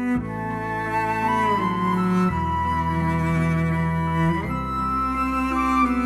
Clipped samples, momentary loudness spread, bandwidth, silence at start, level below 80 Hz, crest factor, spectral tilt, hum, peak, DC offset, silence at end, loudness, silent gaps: under 0.1%; 5 LU; 13 kHz; 0 s; -38 dBFS; 14 dB; -7.5 dB/octave; none; -8 dBFS; under 0.1%; 0 s; -23 LUFS; none